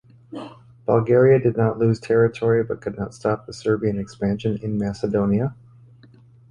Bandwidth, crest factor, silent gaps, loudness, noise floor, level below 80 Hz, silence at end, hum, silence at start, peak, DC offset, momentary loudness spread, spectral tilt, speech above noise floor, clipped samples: 10 kHz; 18 dB; none; -21 LUFS; -50 dBFS; -50 dBFS; 1 s; none; 0.3 s; -4 dBFS; under 0.1%; 15 LU; -8.5 dB/octave; 29 dB; under 0.1%